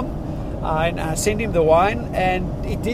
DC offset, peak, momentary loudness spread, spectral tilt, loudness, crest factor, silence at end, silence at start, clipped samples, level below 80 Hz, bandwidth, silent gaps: under 0.1%; -4 dBFS; 11 LU; -5.5 dB/octave; -21 LUFS; 16 dB; 0 s; 0 s; under 0.1%; -30 dBFS; 15.5 kHz; none